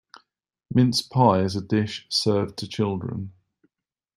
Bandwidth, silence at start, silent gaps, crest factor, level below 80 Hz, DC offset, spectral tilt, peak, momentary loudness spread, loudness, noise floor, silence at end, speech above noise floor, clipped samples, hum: 15.5 kHz; 0.7 s; none; 22 dB; -60 dBFS; under 0.1%; -6 dB/octave; -4 dBFS; 11 LU; -23 LUFS; -83 dBFS; 0.85 s; 60 dB; under 0.1%; none